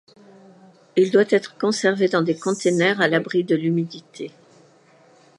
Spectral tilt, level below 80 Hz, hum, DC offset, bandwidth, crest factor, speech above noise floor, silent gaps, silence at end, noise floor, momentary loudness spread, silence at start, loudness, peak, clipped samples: -5 dB/octave; -74 dBFS; none; under 0.1%; 11.5 kHz; 18 dB; 34 dB; none; 1.1 s; -54 dBFS; 15 LU; 0.95 s; -20 LUFS; -4 dBFS; under 0.1%